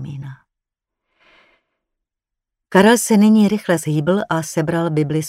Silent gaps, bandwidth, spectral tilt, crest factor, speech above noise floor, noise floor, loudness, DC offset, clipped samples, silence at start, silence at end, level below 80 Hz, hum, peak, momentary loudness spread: none; 16 kHz; -5.5 dB/octave; 18 dB; 68 dB; -83 dBFS; -16 LUFS; under 0.1%; under 0.1%; 0 s; 0 s; -58 dBFS; none; 0 dBFS; 12 LU